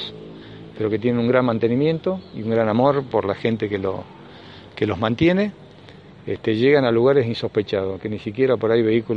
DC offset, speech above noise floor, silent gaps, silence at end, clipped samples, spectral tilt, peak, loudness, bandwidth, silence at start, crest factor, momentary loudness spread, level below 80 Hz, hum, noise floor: under 0.1%; 24 dB; none; 0 s; under 0.1%; -8.5 dB/octave; -2 dBFS; -20 LUFS; 6.8 kHz; 0 s; 18 dB; 20 LU; -54 dBFS; none; -44 dBFS